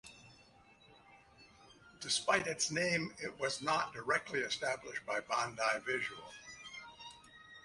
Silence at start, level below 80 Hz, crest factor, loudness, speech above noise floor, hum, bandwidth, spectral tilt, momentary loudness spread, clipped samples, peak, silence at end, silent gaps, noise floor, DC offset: 0.05 s; -72 dBFS; 22 dB; -36 LUFS; 27 dB; none; 11.5 kHz; -2 dB/octave; 18 LU; under 0.1%; -16 dBFS; 0.05 s; none; -64 dBFS; under 0.1%